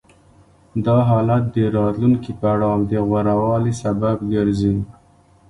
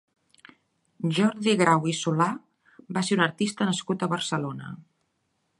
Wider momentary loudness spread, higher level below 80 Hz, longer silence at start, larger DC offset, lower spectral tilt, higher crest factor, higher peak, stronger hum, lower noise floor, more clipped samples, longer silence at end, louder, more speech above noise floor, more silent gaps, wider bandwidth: second, 5 LU vs 14 LU; first, -42 dBFS vs -72 dBFS; second, 0.75 s vs 1 s; neither; first, -9 dB/octave vs -5 dB/octave; second, 14 dB vs 22 dB; about the same, -6 dBFS vs -6 dBFS; neither; second, -52 dBFS vs -74 dBFS; neither; second, 0.6 s vs 0.8 s; first, -19 LUFS vs -25 LUFS; second, 35 dB vs 49 dB; neither; about the same, 11 kHz vs 11.5 kHz